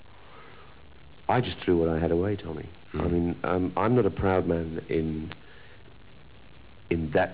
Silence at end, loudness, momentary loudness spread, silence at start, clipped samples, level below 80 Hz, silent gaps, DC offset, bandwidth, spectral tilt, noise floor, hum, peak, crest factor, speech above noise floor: 0 s; -27 LUFS; 14 LU; 0.3 s; under 0.1%; -44 dBFS; none; 0.4%; 4 kHz; -11 dB/octave; -52 dBFS; none; -10 dBFS; 18 dB; 25 dB